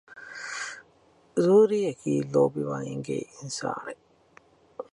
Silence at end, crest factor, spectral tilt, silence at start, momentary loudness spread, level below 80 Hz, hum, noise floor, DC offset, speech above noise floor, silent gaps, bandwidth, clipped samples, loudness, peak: 0.1 s; 18 dB; -6 dB/octave; 0.1 s; 23 LU; -70 dBFS; none; -61 dBFS; under 0.1%; 36 dB; none; 11.5 kHz; under 0.1%; -27 LUFS; -8 dBFS